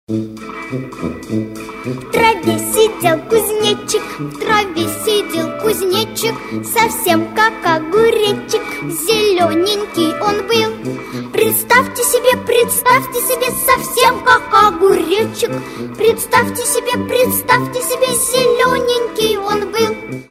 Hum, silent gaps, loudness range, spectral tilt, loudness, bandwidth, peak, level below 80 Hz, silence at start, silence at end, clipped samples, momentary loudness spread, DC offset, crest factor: none; none; 4 LU; -3 dB/octave; -14 LUFS; 16 kHz; 0 dBFS; -46 dBFS; 0.1 s; 0.05 s; under 0.1%; 11 LU; under 0.1%; 14 dB